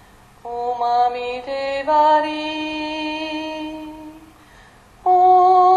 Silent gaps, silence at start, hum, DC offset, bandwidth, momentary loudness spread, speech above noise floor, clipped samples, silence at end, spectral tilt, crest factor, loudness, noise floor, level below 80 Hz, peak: none; 0.45 s; none; under 0.1%; 9.6 kHz; 19 LU; 29 dB; under 0.1%; 0 s; -4 dB/octave; 16 dB; -18 LUFS; -47 dBFS; -54 dBFS; -4 dBFS